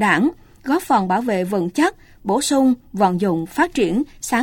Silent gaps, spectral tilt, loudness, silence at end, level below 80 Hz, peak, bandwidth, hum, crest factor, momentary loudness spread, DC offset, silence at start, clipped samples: none; -5 dB/octave; -19 LUFS; 0 s; -48 dBFS; -2 dBFS; 17 kHz; none; 16 dB; 6 LU; under 0.1%; 0 s; under 0.1%